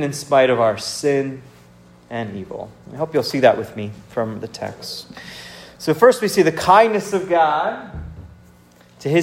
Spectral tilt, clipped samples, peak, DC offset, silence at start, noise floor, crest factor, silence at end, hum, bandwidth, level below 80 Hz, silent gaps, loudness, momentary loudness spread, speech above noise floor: -5 dB/octave; under 0.1%; 0 dBFS; under 0.1%; 0 s; -49 dBFS; 18 dB; 0 s; none; 16 kHz; -50 dBFS; none; -18 LUFS; 21 LU; 31 dB